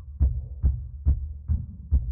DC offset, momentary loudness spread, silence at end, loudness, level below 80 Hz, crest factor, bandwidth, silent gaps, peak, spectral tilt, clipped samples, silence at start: under 0.1%; 3 LU; 0 s; -29 LUFS; -26 dBFS; 14 dB; 1.3 kHz; none; -12 dBFS; -15 dB/octave; under 0.1%; 0 s